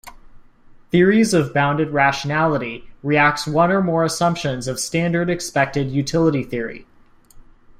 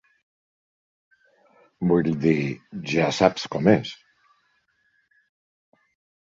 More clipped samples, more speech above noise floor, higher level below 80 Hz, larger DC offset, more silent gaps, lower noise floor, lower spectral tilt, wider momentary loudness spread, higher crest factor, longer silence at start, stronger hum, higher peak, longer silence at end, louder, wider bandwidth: neither; second, 30 dB vs 46 dB; first, -48 dBFS vs -58 dBFS; neither; neither; second, -48 dBFS vs -68 dBFS; about the same, -5.5 dB/octave vs -6.5 dB/octave; second, 8 LU vs 13 LU; second, 16 dB vs 24 dB; second, 0.05 s vs 1.8 s; neither; about the same, -4 dBFS vs -2 dBFS; second, 0.4 s vs 2.35 s; first, -19 LUFS vs -22 LUFS; first, 15.5 kHz vs 7.8 kHz